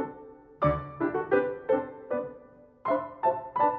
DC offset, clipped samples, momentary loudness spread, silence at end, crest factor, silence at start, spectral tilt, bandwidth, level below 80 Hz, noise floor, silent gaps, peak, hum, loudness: under 0.1%; under 0.1%; 10 LU; 0 s; 18 dB; 0 s; -10.5 dB/octave; 4.8 kHz; -52 dBFS; -53 dBFS; none; -12 dBFS; none; -30 LUFS